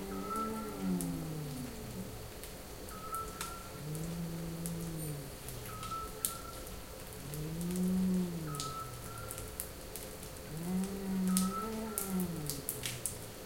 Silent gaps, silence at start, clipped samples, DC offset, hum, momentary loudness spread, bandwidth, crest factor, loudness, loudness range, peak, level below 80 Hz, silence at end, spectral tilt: none; 0 s; under 0.1%; under 0.1%; none; 12 LU; 17 kHz; 32 dB; -39 LUFS; 5 LU; -6 dBFS; -54 dBFS; 0 s; -5 dB/octave